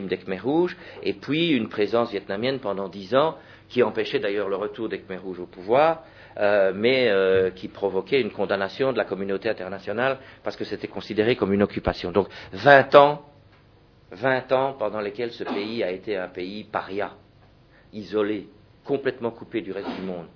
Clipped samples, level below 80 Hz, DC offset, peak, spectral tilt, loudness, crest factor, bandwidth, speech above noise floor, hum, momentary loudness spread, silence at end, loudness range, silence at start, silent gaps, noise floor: under 0.1%; -54 dBFS; under 0.1%; 0 dBFS; -7 dB/octave; -24 LUFS; 24 dB; 5.4 kHz; 31 dB; none; 12 LU; 0.1 s; 10 LU; 0 s; none; -55 dBFS